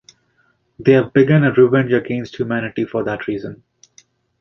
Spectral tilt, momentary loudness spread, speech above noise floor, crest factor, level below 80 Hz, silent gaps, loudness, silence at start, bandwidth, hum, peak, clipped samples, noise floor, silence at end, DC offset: -8.5 dB/octave; 12 LU; 46 dB; 16 dB; -54 dBFS; none; -17 LUFS; 0.8 s; 6.6 kHz; none; -2 dBFS; under 0.1%; -62 dBFS; 0.85 s; under 0.1%